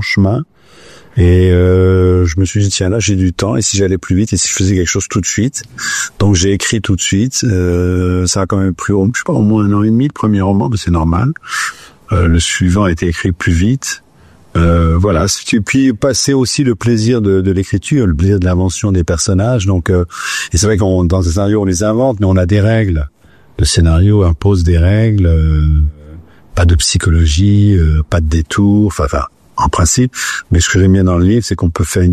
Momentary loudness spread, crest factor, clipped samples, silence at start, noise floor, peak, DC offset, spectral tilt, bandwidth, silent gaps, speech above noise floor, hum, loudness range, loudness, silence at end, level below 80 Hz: 6 LU; 10 dB; under 0.1%; 0 s; -44 dBFS; -2 dBFS; under 0.1%; -5.5 dB/octave; 14 kHz; none; 33 dB; none; 2 LU; -12 LUFS; 0 s; -26 dBFS